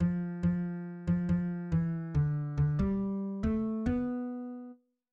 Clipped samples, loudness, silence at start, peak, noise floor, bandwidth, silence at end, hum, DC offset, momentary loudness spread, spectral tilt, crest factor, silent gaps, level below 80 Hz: under 0.1%; -33 LUFS; 0 s; -20 dBFS; -52 dBFS; 4.7 kHz; 0.4 s; none; under 0.1%; 8 LU; -10.5 dB/octave; 12 dB; none; -46 dBFS